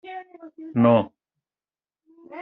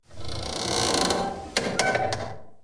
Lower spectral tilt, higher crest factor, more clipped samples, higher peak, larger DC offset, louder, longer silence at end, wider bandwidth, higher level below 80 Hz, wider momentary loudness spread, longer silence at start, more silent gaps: first, -7 dB/octave vs -2.5 dB/octave; about the same, 20 dB vs 20 dB; neither; about the same, -6 dBFS vs -6 dBFS; neither; first, -20 LUFS vs -26 LUFS; about the same, 0 s vs 0 s; second, 4 kHz vs 10.5 kHz; second, -68 dBFS vs -46 dBFS; first, 23 LU vs 11 LU; about the same, 0.05 s vs 0.1 s; neither